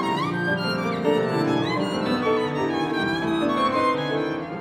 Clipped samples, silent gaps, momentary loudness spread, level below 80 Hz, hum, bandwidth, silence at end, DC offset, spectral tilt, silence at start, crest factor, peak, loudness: under 0.1%; none; 3 LU; -58 dBFS; none; 16 kHz; 0 s; under 0.1%; -6 dB/octave; 0 s; 14 dB; -8 dBFS; -23 LUFS